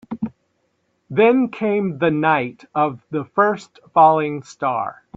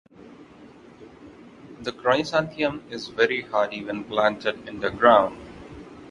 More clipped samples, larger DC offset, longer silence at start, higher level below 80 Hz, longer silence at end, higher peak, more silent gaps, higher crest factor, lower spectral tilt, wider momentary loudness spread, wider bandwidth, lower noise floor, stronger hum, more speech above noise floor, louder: neither; neither; about the same, 0.1 s vs 0.2 s; about the same, -62 dBFS vs -58 dBFS; first, 0.25 s vs 0 s; about the same, -2 dBFS vs -2 dBFS; neither; about the same, 18 dB vs 22 dB; first, -7 dB/octave vs -5 dB/octave; second, 13 LU vs 23 LU; second, 7.8 kHz vs 11 kHz; first, -68 dBFS vs -48 dBFS; neither; first, 49 dB vs 25 dB; first, -19 LUFS vs -23 LUFS